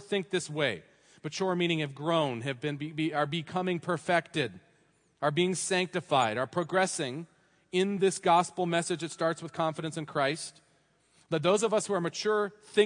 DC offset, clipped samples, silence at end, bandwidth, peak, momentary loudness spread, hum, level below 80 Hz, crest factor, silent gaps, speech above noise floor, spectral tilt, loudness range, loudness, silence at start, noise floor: under 0.1%; under 0.1%; 0 s; 10.5 kHz; -10 dBFS; 8 LU; none; -76 dBFS; 20 dB; none; 38 dB; -4.5 dB/octave; 3 LU; -30 LUFS; 0 s; -68 dBFS